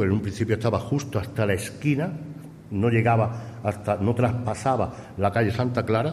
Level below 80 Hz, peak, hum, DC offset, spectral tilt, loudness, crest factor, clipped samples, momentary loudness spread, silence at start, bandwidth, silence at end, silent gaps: -52 dBFS; -8 dBFS; none; under 0.1%; -7 dB/octave; -25 LUFS; 16 dB; under 0.1%; 8 LU; 0 s; 13 kHz; 0 s; none